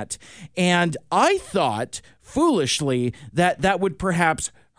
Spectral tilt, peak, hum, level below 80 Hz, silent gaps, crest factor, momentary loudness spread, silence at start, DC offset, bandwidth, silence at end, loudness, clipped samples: -4.5 dB/octave; -4 dBFS; none; -50 dBFS; none; 18 dB; 12 LU; 0 s; 0.1%; 10.5 kHz; 0.3 s; -22 LUFS; under 0.1%